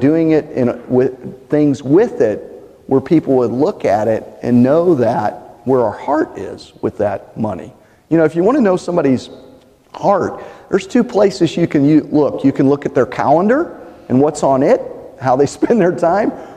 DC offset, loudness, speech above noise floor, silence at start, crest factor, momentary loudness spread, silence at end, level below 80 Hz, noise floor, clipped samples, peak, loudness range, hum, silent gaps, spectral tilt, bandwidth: under 0.1%; -15 LUFS; 30 dB; 0 s; 14 dB; 10 LU; 0 s; -50 dBFS; -44 dBFS; under 0.1%; -2 dBFS; 3 LU; none; none; -7.5 dB/octave; 10 kHz